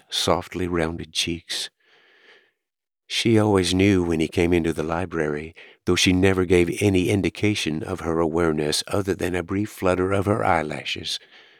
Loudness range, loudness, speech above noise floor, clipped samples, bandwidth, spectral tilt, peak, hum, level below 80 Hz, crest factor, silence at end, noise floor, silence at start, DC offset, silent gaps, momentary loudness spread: 3 LU; -22 LUFS; 66 dB; under 0.1%; 19 kHz; -5 dB/octave; -4 dBFS; none; -48 dBFS; 20 dB; 0.4 s; -88 dBFS; 0.1 s; under 0.1%; none; 9 LU